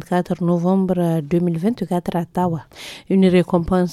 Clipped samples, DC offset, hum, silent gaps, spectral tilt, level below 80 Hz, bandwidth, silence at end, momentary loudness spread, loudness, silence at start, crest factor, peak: under 0.1%; under 0.1%; none; none; -8 dB/octave; -44 dBFS; 13 kHz; 0 s; 8 LU; -19 LUFS; 0 s; 14 dB; -4 dBFS